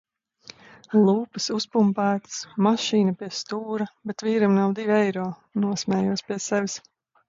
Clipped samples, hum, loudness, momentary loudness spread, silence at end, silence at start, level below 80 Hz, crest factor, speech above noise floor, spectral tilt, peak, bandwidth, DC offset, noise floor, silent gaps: under 0.1%; none; -24 LUFS; 10 LU; 0.5 s; 0.9 s; -68 dBFS; 16 dB; 26 dB; -5.5 dB/octave; -8 dBFS; 7.6 kHz; under 0.1%; -50 dBFS; none